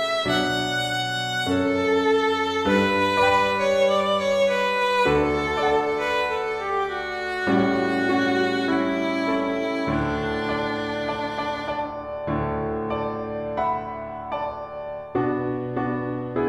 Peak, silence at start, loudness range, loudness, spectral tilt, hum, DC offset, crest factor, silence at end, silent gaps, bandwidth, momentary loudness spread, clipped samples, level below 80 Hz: -8 dBFS; 0 s; 7 LU; -23 LUFS; -5 dB/octave; none; under 0.1%; 16 dB; 0 s; none; 14 kHz; 9 LU; under 0.1%; -46 dBFS